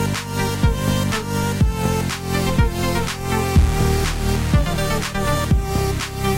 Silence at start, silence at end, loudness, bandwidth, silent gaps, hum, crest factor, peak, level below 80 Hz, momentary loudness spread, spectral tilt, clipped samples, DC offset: 0 s; 0 s; -20 LUFS; 16 kHz; none; none; 16 dB; -2 dBFS; -24 dBFS; 4 LU; -5.5 dB/octave; under 0.1%; under 0.1%